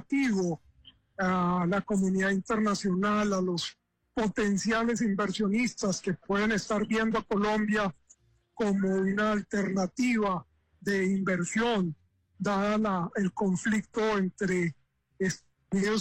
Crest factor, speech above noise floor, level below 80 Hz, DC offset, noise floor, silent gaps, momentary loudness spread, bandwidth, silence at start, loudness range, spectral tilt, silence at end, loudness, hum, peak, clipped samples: 10 dB; 35 dB; -58 dBFS; under 0.1%; -63 dBFS; none; 6 LU; 9.8 kHz; 0 s; 1 LU; -5.5 dB/octave; 0 s; -29 LUFS; none; -18 dBFS; under 0.1%